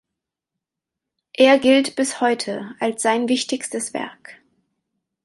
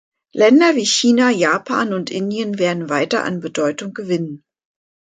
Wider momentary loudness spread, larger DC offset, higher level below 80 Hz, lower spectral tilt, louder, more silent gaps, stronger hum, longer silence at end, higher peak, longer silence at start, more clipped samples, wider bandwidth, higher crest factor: first, 13 LU vs 10 LU; neither; about the same, -68 dBFS vs -66 dBFS; second, -2.5 dB/octave vs -4 dB/octave; about the same, -19 LUFS vs -17 LUFS; neither; neither; first, 0.9 s vs 0.75 s; about the same, -2 dBFS vs -2 dBFS; first, 1.4 s vs 0.35 s; neither; first, 11.5 kHz vs 9.4 kHz; about the same, 20 dB vs 16 dB